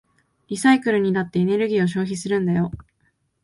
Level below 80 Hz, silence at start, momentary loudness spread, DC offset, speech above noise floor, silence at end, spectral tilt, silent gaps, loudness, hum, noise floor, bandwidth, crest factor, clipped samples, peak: -54 dBFS; 0.5 s; 9 LU; under 0.1%; 47 dB; 0.6 s; -6 dB/octave; none; -21 LUFS; none; -67 dBFS; 11.5 kHz; 18 dB; under 0.1%; -4 dBFS